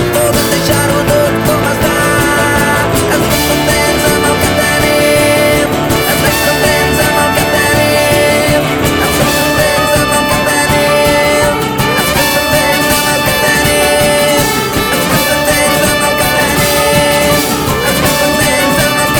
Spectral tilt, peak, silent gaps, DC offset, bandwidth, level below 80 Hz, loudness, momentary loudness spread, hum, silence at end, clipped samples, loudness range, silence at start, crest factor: -3.5 dB/octave; 0 dBFS; none; under 0.1%; over 20 kHz; -28 dBFS; -9 LUFS; 2 LU; none; 0 s; under 0.1%; 1 LU; 0 s; 10 dB